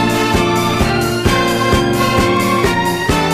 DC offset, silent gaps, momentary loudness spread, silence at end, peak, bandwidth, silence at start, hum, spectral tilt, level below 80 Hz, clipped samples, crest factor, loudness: under 0.1%; none; 2 LU; 0 s; 0 dBFS; 15.5 kHz; 0 s; none; -5 dB/octave; -28 dBFS; under 0.1%; 14 dB; -14 LUFS